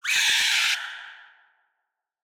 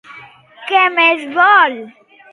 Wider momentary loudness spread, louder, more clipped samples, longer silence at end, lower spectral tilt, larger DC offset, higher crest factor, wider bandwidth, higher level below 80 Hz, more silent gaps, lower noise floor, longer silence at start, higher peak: first, 18 LU vs 15 LU; second, -20 LUFS vs -12 LUFS; neither; first, 1.05 s vs 0.45 s; second, 4.5 dB/octave vs -3 dB/octave; neither; about the same, 18 dB vs 14 dB; first, over 20 kHz vs 11.5 kHz; about the same, -72 dBFS vs -72 dBFS; neither; first, -81 dBFS vs -40 dBFS; about the same, 0.05 s vs 0.1 s; second, -8 dBFS vs 0 dBFS